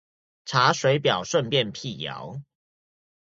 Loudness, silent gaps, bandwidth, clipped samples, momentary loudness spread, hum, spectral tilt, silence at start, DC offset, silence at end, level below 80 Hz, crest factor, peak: -24 LUFS; none; 7.8 kHz; under 0.1%; 18 LU; none; -4 dB/octave; 0.45 s; under 0.1%; 0.85 s; -64 dBFS; 22 dB; -4 dBFS